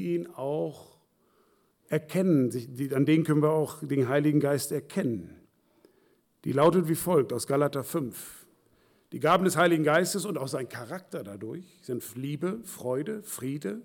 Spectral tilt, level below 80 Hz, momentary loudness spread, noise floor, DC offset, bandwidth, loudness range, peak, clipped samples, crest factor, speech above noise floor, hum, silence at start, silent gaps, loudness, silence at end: -6 dB/octave; -70 dBFS; 15 LU; -67 dBFS; under 0.1%; 19 kHz; 4 LU; -12 dBFS; under 0.1%; 18 dB; 40 dB; none; 0 s; none; -28 LUFS; 0 s